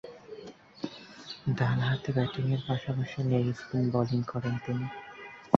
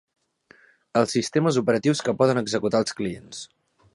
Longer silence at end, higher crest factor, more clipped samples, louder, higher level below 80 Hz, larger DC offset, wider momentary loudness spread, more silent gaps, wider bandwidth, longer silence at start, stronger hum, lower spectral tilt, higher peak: second, 0 s vs 0.5 s; first, 28 dB vs 20 dB; neither; second, -31 LUFS vs -23 LUFS; about the same, -60 dBFS vs -62 dBFS; neither; about the same, 18 LU vs 16 LU; neither; second, 6.8 kHz vs 11.5 kHz; second, 0.05 s vs 0.95 s; neither; first, -8 dB/octave vs -5 dB/octave; first, -2 dBFS vs -6 dBFS